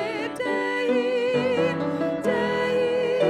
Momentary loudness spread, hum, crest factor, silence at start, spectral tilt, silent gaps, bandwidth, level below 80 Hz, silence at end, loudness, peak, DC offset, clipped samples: 3 LU; none; 14 dB; 0 s; -6 dB/octave; none; 11.5 kHz; -64 dBFS; 0 s; -24 LUFS; -10 dBFS; under 0.1%; under 0.1%